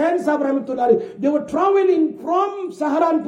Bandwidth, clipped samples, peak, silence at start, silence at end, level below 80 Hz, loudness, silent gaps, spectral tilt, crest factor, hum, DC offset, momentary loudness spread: 10.5 kHz; under 0.1%; -4 dBFS; 0 s; 0 s; -64 dBFS; -19 LUFS; none; -6.5 dB/octave; 14 dB; none; under 0.1%; 5 LU